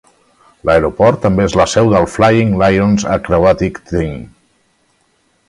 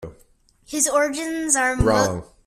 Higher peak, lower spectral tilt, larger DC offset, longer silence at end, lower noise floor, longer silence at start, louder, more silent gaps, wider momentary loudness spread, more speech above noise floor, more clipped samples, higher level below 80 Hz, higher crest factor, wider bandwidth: about the same, 0 dBFS vs -2 dBFS; first, -6.5 dB/octave vs -3.5 dB/octave; neither; first, 1.25 s vs 0.2 s; about the same, -58 dBFS vs -57 dBFS; first, 0.65 s vs 0 s; first, -12 LUFS vs -20 LUFS; neither; about the same, 8 LU vs 9 LU; first, 46 dB vs 36 dB; neither; about the same, -34 dBFS vs -38 dBFS; second, 14 dB vs 20 dB; second, 11.5 kHz vs 15.5 kHz